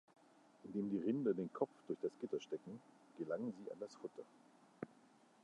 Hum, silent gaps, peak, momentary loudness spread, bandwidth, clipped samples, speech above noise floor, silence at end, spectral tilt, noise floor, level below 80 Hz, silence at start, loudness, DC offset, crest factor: none; none; -24 dBFS; 18 LU; 10.5 kHz; under 0.1%; 25 dB; 0.55 s; -7.5 dB/octave; -69 dBFS; -90 dBFS; 0.65 s; -45 LUFS; under 0.1%; 22 dB